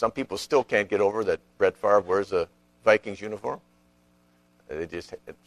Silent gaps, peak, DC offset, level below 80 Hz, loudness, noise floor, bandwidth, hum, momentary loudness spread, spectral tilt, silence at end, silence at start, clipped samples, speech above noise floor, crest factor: none; -4 dBFS; under 0.1%; -60 dBFS; -26 LUFS; -63 dBFS; 13.5 kHz; 60 Hz at -65 dBFS; 14 LU; -4.5 dB/octave; 0.15 s; 0 s; under 0.1%; 37 dB; 22 dB